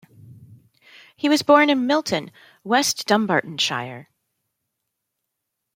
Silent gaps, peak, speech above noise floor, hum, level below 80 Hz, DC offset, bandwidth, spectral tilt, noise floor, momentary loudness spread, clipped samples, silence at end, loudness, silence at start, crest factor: none; -2 dBFS; 60 dB; none; -70 dBFS; under 0.1%; 16.5 kHz; -3.5 dB/octave; -80 dBFS; 14 LU; under 0.1%; 1.75 s; -20 LUFS; 0.3 s; 20 dB